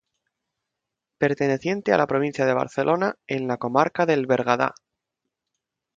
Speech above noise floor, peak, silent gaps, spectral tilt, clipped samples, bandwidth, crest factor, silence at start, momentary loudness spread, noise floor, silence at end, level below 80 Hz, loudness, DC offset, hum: 62 dB; -4 dBFS; none; -6.5 dB/octave; under 0.1%; 7.8 kHz; 22 dB; 1.2 s; 5 LU; -84 dBFS; 1.25 s; -66 dBFS; -23 LUFS; under 0.1%; none